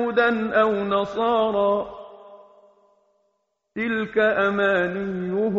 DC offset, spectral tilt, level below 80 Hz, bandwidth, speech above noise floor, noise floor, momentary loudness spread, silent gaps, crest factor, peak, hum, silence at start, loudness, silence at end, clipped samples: under 0.1%; -3.5 dB/octave; -58 dBFS; 7.6 kHz; 52 dB; -73 dBFS; 10 LU; none; 16 dB; -6 dBFS; none; 0 s; -22 LUFS; 0 s; under 0.1%